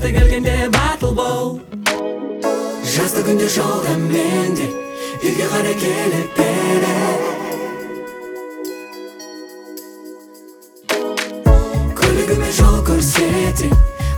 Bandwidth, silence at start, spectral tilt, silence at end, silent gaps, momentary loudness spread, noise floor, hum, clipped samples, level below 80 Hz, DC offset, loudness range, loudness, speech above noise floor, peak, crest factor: 20 kHz; 0 s; -5 dB/octave; 0 s; none; 17 LU; -42 dBFS; none; under 0.1%; -22 dBFS; under 0.1%; 11 LU; -17 LUFS; 26 dB; 0 dBFS; 16 dB